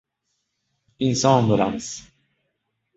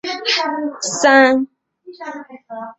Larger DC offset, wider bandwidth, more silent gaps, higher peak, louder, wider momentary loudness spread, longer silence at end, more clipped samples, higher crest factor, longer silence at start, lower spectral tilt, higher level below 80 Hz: neither; about the same, 8.2 kHz vs 8.2 kHz; neither; about the same, -2 dBFS vs -2 dBFS; second, -20 LUFS vs -15 LUFS; second, 16 LU vs 22 LU; first, 0.95 s vs 0.05 s; neither; first, 22 dB vs 16 dB; first, 1 s vs 0.05 s; first, -5.5 dB/octave vs -1.5 dB/octave; first, -56 dBFS vs -66 dBFS